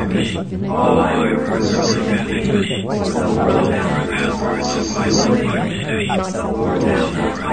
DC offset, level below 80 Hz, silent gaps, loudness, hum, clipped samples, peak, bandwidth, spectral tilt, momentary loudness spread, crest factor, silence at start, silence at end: 0.7%; -38 dBFS; none; -18 LUFS; none; under 0.1%; -2 dBFS; 9.6 kHz; -5.5 dB/octave; 5 LU; 16 dB; 0 s; 0 s